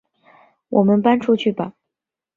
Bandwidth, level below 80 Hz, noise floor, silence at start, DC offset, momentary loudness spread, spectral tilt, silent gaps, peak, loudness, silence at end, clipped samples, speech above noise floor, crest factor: 7 kHz; -62 dBFS; -85 dBFS; 0.7 s; under 0.1%; 12 LU; -8.5 dB/octave; none; -2 dBFS; -18 LUFS; 0.65 s; under 0.1%; 68 dB; 18 dB